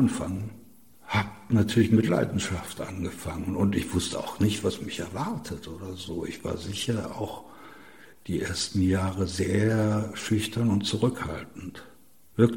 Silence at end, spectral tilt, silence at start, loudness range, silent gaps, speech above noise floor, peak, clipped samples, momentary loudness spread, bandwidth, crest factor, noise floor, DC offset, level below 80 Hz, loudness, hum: 0 s; -5.5 dB/octave; 0 s; 7 LU; none; 27 dB; -6 dBFS; under 0.1%; 14 LU; 17 kHz; 22 dB; -54 dBFS; 0.2%; -52 dBFS; -28 LUFS; none